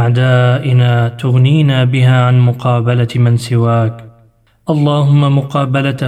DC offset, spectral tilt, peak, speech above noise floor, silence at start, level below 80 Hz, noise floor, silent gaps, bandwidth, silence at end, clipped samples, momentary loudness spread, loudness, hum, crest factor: under 0.1%; -8 dB/octave; 0 dBFS; 39 dB; 0 s; -52 dBFS; -49 dBFS; none; 9.6 kHz; 0 s; under 0.1%; 5 LU; -12 LUFS; none; 10 dB